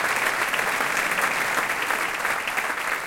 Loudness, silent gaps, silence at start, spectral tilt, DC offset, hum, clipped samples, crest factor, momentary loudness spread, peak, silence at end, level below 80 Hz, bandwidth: -23 LUFS; none; 0 s; -1 dB/octave; under 0.1%; none; under 0.1%; 16 dB; 3 LU; -8 dBFS; 0 s; -58 dBFS; 17 kHz